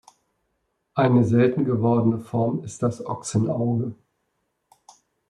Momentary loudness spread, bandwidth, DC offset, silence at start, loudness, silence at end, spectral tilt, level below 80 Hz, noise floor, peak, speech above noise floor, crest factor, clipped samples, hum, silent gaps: 9 LU; 11 kHz; under 0.1%; 0.95 s; -23 LUFS; 1.35 s; -7.5 dB/octave; -62 dBFS; -74 dBFS; -6 dBFS; 53 dB; 18 dB; under 0.1%; none; none